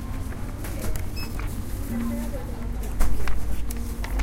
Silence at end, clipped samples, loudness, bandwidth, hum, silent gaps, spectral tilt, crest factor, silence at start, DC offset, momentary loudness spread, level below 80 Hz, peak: 0 s; under 0.1%; -32 LUFS; 16.5 kHz; none; none; -5.5 dB/octave; 16 dB; 0 s; under 0.1%; 4 LU; -28 dBFS; -6 dBFS